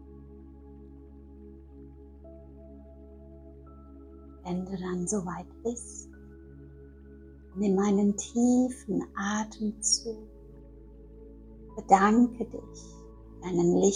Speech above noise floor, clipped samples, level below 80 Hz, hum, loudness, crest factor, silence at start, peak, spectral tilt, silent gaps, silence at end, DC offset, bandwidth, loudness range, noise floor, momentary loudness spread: 22 dB; under 0.1%; -52 dBFS; none; -28 LUFS; 26 dB; 0 s; -6 dBFS; -4.5 dB/octave; none; 0 s; under 0.1%; 11 kHz; 22 LU; -49 dBFS; 26 LU